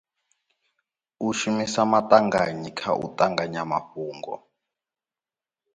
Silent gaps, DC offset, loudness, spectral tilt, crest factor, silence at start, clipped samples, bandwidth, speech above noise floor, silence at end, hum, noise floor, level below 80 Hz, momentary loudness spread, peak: none; under 0.1%; -24 LUFS; -4.5 dB/octave; 24 dB; 1.2 s; under 0.1%; 9.6 kHz; over 67 dB; 1.35 s; none; under -90 dBFS; -64 dBFS; 16 LU; -2 dBFS